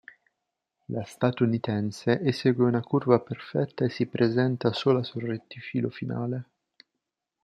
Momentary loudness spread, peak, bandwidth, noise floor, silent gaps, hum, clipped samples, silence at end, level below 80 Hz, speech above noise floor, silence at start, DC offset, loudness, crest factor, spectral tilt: 10 LU; -4 dBFS; 11 kHz; -84 dBFS; none; none; under 0.1%; 1 s; -68 dBFS; 58 dB; 0.9 s; under 0.1%; -27 LUFS; 22 dB; -7.5 dB/octave